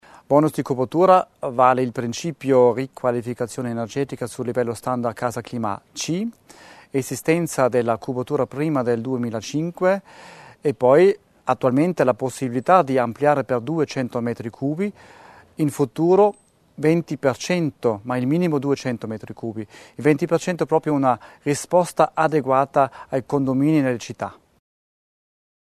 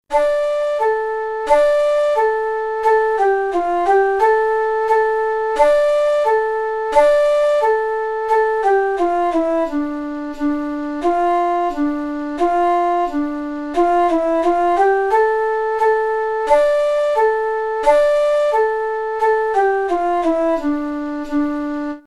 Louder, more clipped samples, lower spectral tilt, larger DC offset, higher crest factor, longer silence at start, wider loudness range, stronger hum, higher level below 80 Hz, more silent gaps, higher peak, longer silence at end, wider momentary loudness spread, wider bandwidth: second, -21 LUFS vs -17 LUFS; neither; first, -6.5 dB/octave vs -4 dB/octave; neither; about the same, 20 dB vs 16 dB; first, 0.3 s vs 0.1 s; about the same, 5 LU vs 3 LU; neither; second, -62 dBFS vs -44 dBFS; neither; about the same, -2 dBFS vs 0 dBFS; first, 1.3 s vs 0.05 s; first, 11 LU vs 7 LU; first, 13.5 kHz vs 12 kHz